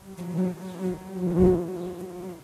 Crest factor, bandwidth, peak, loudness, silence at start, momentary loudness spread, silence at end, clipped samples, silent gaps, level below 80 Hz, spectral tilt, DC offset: 18 dB; 14.5 kHz; -8 dBFS; -27 LUFS; 0 s; 14 LU; 0 s; under 0.1%; none; -44 dBFS; -9 dB/octave; under 0.1%